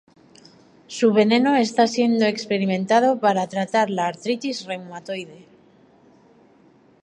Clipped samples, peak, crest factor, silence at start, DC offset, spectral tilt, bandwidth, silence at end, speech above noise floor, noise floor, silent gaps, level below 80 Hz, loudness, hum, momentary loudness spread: under 0.1%; -4 dBFS; 18 dB; 0.9 s; under 0.1%; -5 dB/octave; 10.5 kHz; 1.65 s; 34 dB; -54 dBFS; none; -72 dBFS; -20 LUFS; none; 15 LU